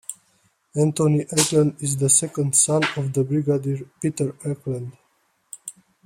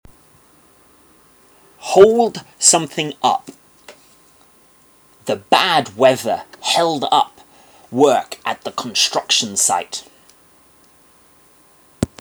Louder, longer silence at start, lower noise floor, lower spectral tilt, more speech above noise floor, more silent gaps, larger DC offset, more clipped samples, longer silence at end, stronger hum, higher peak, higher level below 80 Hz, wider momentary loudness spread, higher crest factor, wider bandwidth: second, -21 LUFS vs -16 LUFS; second, 0.1 s vs 1.8 s; first, -65 dBFS vs -51 dBFS; first, -4.5 dB/octave vs -2 dB/octave; first, 44 dB vs 35 dB; neither; neither; neither; first, 0.35 s vs 0.15 s; neither; second, -4 dBFS vs 0 dBFS; second, -60 dBFS vs -54 dBFS; first, 20 LU vs 14 LU; about the same, 20 dB vs 20 dB; second, 16 kHz vs over 20 kHz